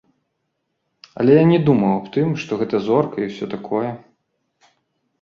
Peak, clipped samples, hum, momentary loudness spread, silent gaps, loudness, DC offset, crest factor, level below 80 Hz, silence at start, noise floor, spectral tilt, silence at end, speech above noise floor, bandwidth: -2 dBFS; under 0.1%; none; 12 LU; none; -18 LUFS; under 0.1%; 18 dB; -60 dBFS; 1.15 s; -74 dBFS; -8.5 dB/octave; 1.25 s; 56 dB; 7 kHz